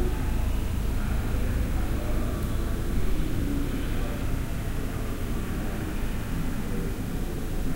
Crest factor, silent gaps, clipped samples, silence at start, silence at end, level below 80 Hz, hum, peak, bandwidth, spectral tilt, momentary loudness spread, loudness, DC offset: 12 dB; none; under 0.1%; 0 s; 0 s; -28 dBFS; none; -14 dBFS; 16 kHz; -6.5 dB/octave; 3 LU; -31 LUFS; under 0.1%